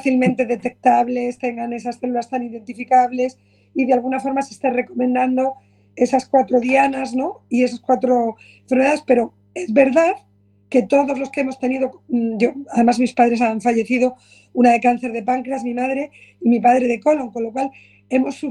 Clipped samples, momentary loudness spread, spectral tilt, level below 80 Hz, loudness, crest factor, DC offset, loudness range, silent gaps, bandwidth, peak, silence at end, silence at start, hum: under 0.1%; 10 LU; -6 dB/octave; -62 dBFS; -19 LUFS; 18 dB; under 0.1%; 3 LU; none; 10.5 kHz; 0 dBFS; 0 s; 0 s; 50 Hz at -55 dBFS